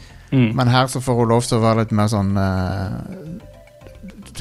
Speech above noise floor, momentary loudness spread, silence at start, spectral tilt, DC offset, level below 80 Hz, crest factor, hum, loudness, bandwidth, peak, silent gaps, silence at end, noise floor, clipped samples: 24 dB; 19 LU; 0 s; -6.5 dB/octave; under 0.1%; -44 dBFS; 16 dB; none; -18 LUFS; 13 kHz; -2 dBFS; none; 0 s; -42 dBFS; under 0.1%